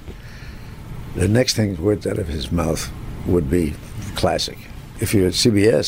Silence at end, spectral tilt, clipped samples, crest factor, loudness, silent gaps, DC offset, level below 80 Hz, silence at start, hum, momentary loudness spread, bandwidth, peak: 0 s; -5 dB/octave; under 0.1%; 16 dB; -20 LUFS; none; under 0.1%; -34 dBFS; 0 s; none; 21 LU; 16 kHz; -4 dBFS